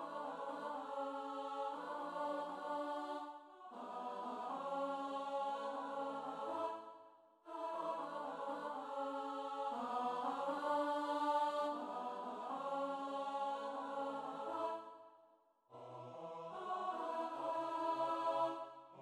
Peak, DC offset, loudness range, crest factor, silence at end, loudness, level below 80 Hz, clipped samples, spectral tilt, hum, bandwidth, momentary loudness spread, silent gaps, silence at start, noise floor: -26 dBFS; under 0.1%; 5 LU; 18 dB; 0 s; -43 LUFS; -90 dBFS; under 0.1%; -4.5 dB/octave; none; 12.5 kHz; 12 LU; none; 0 s; -71 dBFS